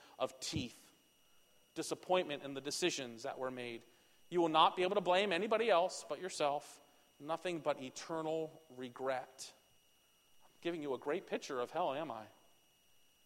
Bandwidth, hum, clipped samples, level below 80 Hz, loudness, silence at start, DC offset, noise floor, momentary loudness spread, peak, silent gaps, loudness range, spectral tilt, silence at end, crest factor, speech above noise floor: 16.5 kHz; none; under 0.1%; -76 dBFS; -38 LUFS; 0 s; under 0.1%; -71 dBFS; 16 LU; -14 dBFS; none; 9 LU; -3.5 dB/octave; 1 s; 24 dB; 33 dB